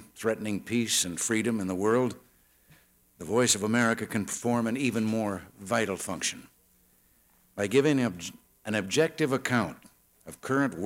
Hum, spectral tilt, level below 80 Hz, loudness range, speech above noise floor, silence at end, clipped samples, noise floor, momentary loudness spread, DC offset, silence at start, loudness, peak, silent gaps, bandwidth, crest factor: none; -4 dB/octave; -66 dBFS; 3 LU; 36 dB; 0 s; under 0.1%; -64 dBFS; 15 LU; under 0.1%; 0 s; -28 LUFS; -12 dBFS; none; 16.5 kHz; 18 dB